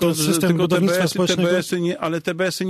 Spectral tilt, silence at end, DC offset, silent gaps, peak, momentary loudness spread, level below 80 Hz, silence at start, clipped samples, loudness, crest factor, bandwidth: -5 dB/octave; 0 s; under 0.1%; none; -6 dBFS; 5 LU; -58 dBFS; 0 s; under 0.1%; -19 LUFS; 14 dB; 14 kHz